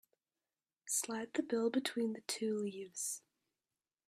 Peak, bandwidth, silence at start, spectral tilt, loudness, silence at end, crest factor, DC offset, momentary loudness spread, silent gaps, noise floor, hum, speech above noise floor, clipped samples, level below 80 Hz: -20 dBFS; 15.5 kHz; 0.85 s; -3 dB/octave; -39 LUFS; 0.9 s; 20 dB; under 0.1%; 6 LU; none; under -90 dBFS; none; over 52 dB; under 0.1%; -88 dBFS